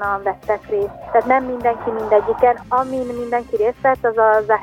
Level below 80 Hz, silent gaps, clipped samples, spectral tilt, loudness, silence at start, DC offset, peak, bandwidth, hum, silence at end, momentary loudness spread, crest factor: -48 dBFS; none; under 0.1%; -7 dB/octave; -18 LUFS; 0 s; under 0.1%; -2 dBFS; 15.5 kHz; none; 0 s; 8 LU; 16 dB